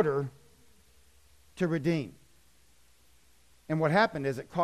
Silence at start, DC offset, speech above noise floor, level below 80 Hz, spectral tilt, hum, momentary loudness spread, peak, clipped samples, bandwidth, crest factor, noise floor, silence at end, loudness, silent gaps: 0 s; under 0.1%; 36 dB; -64 dBFS; -7 dB/octave; 60 Hz at -70 dBFS; 16 LU; -14 dBFS; under 0.1%; 13 kHz; 20 dB; -65 dBFS; 0 s; -30 LUFS; none